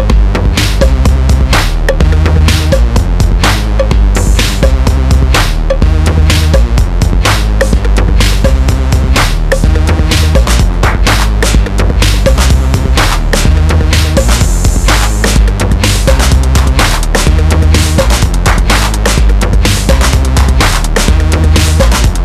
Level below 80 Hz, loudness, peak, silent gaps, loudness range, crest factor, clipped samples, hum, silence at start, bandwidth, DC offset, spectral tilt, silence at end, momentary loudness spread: -8 dBFS; -9 LUFS; 0 dBFS; none; 1 LU; 6 dB; under 0.1%; none; 0 s; 14 kHz; under 0.1%; -4.5 dB/octave; 0 s; 2 LU